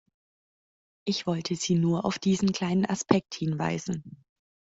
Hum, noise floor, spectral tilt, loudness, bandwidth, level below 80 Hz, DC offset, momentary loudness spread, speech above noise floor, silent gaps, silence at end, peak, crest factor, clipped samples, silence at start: none; under -90 dBFS; -5.5 dB/octave; -28 LUFS; 8 kHz; -62 dBFS; under 0.1%; 8 LU; over 63 dB; none; 0.6 s; -4 dBFS; 24 dB; under 0.1%; 1.05 s